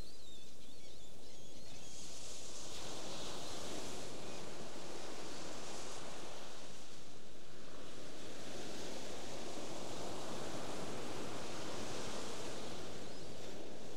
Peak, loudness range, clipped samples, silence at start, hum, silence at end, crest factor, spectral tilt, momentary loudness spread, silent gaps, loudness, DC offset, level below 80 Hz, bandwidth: -28 dBFS; 5 LU; under 0.1%; 0 s; none; 0 s; 16 dB; -3 dB/octave; 11 LU; none; -48 LUFS; 2%; -68 dBFS; 16 kHz